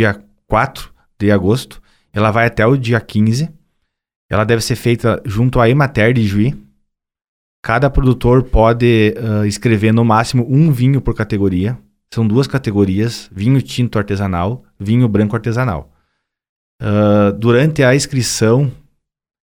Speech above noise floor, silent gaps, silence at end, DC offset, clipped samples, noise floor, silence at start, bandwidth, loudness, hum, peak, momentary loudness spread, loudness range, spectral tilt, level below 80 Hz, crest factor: 55 dB; 4.16-4.29 s, 7.28-7.63 s, 16.49-16.79 s; 0.7 s; under 0.1%; under 0.1%; -68 dBFS; 0 s; 16.5 kHz; -14 LUFS; none; 0 dBFS; 9 LU; 4 LU; -6.5 dB/octave; -30 dBFS; 14 dB